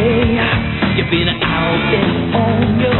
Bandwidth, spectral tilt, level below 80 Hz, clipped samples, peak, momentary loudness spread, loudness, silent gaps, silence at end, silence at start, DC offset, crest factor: 4.2 kHz; -4.5 dB/octave; -30 dBFS; under 0.1%; 0 dBFS; 2 LU; -15 LUFS; none; 0 s; 0 s; 0.4%; 14 dB